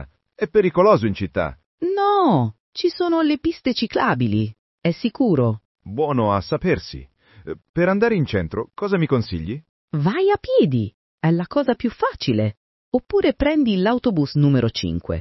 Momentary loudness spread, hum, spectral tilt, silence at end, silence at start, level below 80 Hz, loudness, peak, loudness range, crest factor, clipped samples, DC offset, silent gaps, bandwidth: 11 LU; none; -8 dB/octave; 0 s; 0 s; -46 dBFS; -20 LUFS; -4 dBFS; 3 LU; 18 dB; under 0.1%; under 0.1%; 1.66-1.78 s, 2.60-2.73 s, 4.59-4.78 s, 5.65-5.75 s, 7.69-7.74 s, 9.69-9.88 s, 10.94-11.18 s, 12.57-12.92 s; 6 kHz